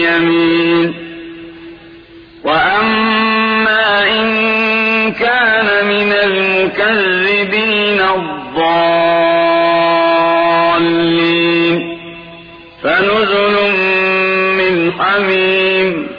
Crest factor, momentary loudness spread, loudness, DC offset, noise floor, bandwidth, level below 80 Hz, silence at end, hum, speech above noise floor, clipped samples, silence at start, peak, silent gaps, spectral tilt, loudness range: 12 dB; 7 LU; -11 LUFS; under 0.1%; -37 dBFS; 5.2 kHz; -48 dBFS; 0 s; none; 26 dB; under 0.1%; 0 s; -2 dBFS; none; -7 dB/octave; 2 LU